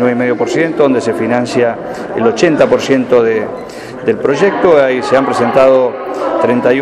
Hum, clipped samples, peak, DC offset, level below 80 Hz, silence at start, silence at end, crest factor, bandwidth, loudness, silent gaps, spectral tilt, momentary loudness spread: none; under 0.1%; 0 dBFS; under 0.1%; -50 dBFS; 0 s; 0 s; 12 dB; 12 kHz; -12 LUFS; none; -5.5 dB/octave; 9 LU